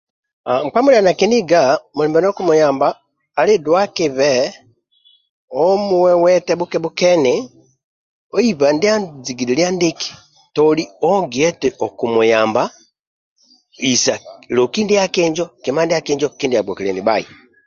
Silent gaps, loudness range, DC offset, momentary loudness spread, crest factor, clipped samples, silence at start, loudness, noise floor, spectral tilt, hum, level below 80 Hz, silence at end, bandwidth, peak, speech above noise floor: 5.30-5.48 s, 7.84-8.30 s, 13.01-13.36 s; 3 LU; under 0.1%; 9 LU; 16 dB; under 0.1%; 0.45 s; -16 LUFS; -55 dBFS; -4 dB/octave; none; -58 dBFS; 0.4 s; 7.6 kHz; -2 dBFS; 40 dB